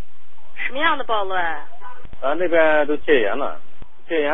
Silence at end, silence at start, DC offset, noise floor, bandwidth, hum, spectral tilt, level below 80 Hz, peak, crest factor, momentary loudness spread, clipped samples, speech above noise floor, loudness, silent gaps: 0 s; 0 s; 10%; -53 dBFS; 3.9 kHz; none; -9 dB/octave; -52 dBFS; -2 dBFS; 18 dB; 21 LU; under 0.1%; 34 dB; -20 LUFS; none